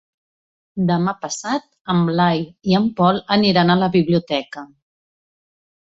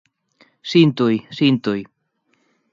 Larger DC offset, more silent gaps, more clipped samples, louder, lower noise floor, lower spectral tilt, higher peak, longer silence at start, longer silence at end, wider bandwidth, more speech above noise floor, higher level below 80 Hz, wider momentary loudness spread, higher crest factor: neither; first, 1.81-1.85 s vs none; neither; about the same, -18 LUFS vs -18 LUFS; first, under -90 dBFS vs -67 dBFS; about the same, -6 dB/octave vs -7 dB/octave; about the same, -2 dBFS vs -2 dBFS; about the same, 0.75 s vs 0.65 s; first, 1.3 s vs 0.9 s; about the same, 7.8 kHz vs 7.4 kHz; first, over 72 dB vs 50 dB; first, -56 dBFS vs -64 dBFS; about the same, 10 LU vs 11 LU; about the same, 18 dB vs 18 dB